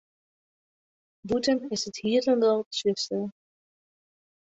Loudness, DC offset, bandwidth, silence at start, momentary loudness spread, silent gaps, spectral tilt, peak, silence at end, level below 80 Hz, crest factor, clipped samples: -26 LUFS; under 0.1%; 8.4 kHz; 1.25 s; 10 LU; 2.66-2.71 s; -4 dB/octave; -12 dBFS; 1.2 s; -66 dBFS; 16 dB; under 0.1%